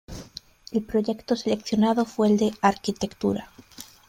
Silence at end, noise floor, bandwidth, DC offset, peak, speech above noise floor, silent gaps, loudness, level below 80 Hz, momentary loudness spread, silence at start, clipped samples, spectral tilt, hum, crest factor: 0.25 s; -46 dBFS; 15.5 kHz; under 0.1%; -4 dBFS; 23 dB; none; -25 LUFS; -54 dBFS; 19 LU; 0.1 s; under 0.1%; -5.5 dB/octave; none; 20 dB